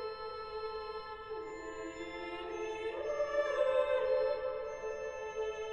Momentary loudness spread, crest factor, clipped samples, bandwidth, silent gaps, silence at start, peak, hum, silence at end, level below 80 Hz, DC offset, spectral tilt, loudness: 12 LU; 18 dB; under 0.1%; 8.4 kHz; none; 0 s; -20 dBFS; none; 0 s; -62 dBFS; under 0.1%; -4 dB/octave; -37 LUFS